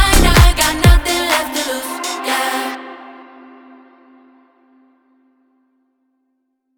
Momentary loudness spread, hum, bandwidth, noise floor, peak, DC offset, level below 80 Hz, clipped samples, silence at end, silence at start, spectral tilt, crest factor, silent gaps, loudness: 19 LU; none; over 20 kHz; -68 dBFS; 0 dBFS; under 0.1%; -20 dBFS; under 0.1%; 3.55 s; 0 s; -4 dB/octave; 16 dB; none; -14 LUFS